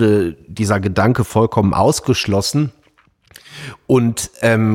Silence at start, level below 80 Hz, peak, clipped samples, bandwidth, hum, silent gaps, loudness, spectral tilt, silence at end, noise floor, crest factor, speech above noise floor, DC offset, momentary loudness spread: 0 s; -44 dBFS; -2 dBFS; under 0.1%; 16.5 kHz; none; none; -16 LUFS; -5.5 dB/octave; 0 s; -55 dBFS; 14 dB; 40 dB; under 0.1%; 11 LU